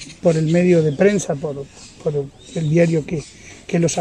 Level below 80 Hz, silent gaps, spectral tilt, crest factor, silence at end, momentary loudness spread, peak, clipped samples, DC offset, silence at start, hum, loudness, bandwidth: -50 dBFS; none; -6.5 dB/octave; 16 dB; 0 s; 15 LU; -2 dBFS; under 0.1%; under 0.1%; 0 s; none; -19 LUFS; 10.5 kHz